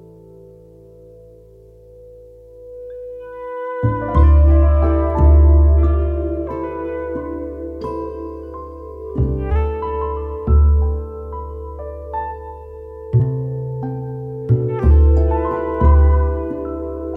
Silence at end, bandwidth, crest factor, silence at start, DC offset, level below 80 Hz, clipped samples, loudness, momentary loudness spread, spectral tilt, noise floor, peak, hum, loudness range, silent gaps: 0 s; 2.8 kHz; 16 dB; 2 s; under 0.1%; -18 dBFS; under 0.1%; -18 LUFS; 19 LU; -11.5 dB/octave; -44 dBFS; -2 dBFS; none; 11 LU; none